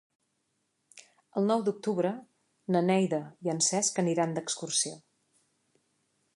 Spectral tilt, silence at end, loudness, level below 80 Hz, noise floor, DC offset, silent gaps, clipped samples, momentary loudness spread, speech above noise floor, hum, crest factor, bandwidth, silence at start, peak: -4 dB/octave; 1.35 s; -29 LUFS; -80 dBFS; -78 dBFS; under 0.1%; none; under 0.1%; 9 LU; 49 dB; none; 18 dB; 11.5 kHz; 0.95 s; -14 dBFS